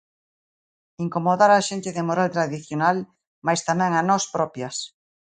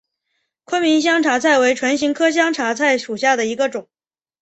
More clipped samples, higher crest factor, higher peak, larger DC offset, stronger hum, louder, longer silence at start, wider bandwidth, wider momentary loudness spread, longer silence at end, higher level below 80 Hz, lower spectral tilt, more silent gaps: neither; about the same, 18 dB vs 16 dB; about the same, -4 dBFS vs -2 dBFS; neither; neither; second, -22 LUFS vs -17 LUFS; first, 1 s vs 0.7 s; first, 9.6 kHz vs 8.4 kHz; first, 13 LU vs 7 LU; second, 0.45 s vs 0.6 s; about the same, -68 dBFS vs -64 dBFS; first, -4.5 dB/octave vs -2.5 dB/octave; first, 3.27-3.42 s vs none